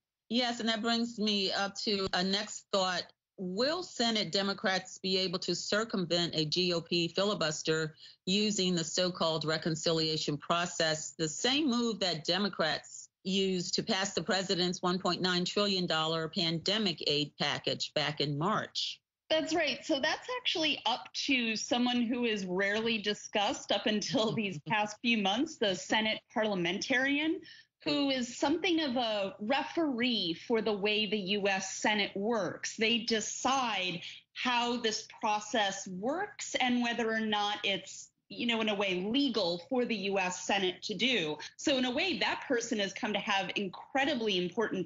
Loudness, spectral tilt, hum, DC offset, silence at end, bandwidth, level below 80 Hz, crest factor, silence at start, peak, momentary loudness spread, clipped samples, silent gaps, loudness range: -31 LUFS; -2 dB/octave; none; under 0.1%; 0 s; 8 kHz; -72 dBFS; 16 dB; 0.3 s; -16 dBFS; 5 LU; under 0.1%; none; 1 LU